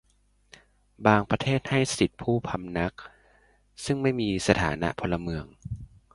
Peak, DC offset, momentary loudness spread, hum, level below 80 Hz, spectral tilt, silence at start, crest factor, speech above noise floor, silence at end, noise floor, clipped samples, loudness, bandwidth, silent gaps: -4 dBFS; under 0.1%; 16 LU; 50 Hz at -55 dBFS; -48 dBFS; -5.5 dB/octave; 1 s; 24 dB; 39 dB; 0.3 s; -65 dBFS; under 0.1%; -27 LUFS; 11.5 kHz; none